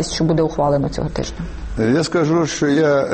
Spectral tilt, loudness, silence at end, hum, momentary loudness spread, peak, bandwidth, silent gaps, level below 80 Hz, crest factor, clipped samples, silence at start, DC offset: -5.5 dB/octave; -18 LUFS; 0 s; none; 10 LU; -6 dBFS; 8.8 kHz; none; -34 dBFS; 12 dB; under 0.1%; 0 s; under 0.1%